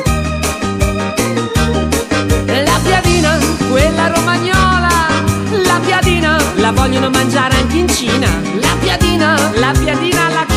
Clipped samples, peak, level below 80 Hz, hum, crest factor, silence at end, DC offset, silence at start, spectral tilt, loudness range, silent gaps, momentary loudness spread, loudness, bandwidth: under 0.1%; 0 dBFS; -22 dBFS; none; 12 dB; 0 s; under 0.1%; 0 s; -4.5 dB/octave; 1 LU; none; 4 LU; -12 LUFS; 15.5 kHz